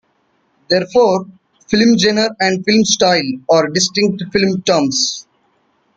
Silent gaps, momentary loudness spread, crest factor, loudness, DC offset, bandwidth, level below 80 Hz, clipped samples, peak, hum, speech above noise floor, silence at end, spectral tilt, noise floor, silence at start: none; 6 LU; 16 dB; -14 LUFS; under 0.1%; 9.2 kHz; -52 dBFS; under 0.1%; 0 dBFS; none; 47 dB; 0.75 s; -3.5 dB/octave; -61 dBFS; 0.7 s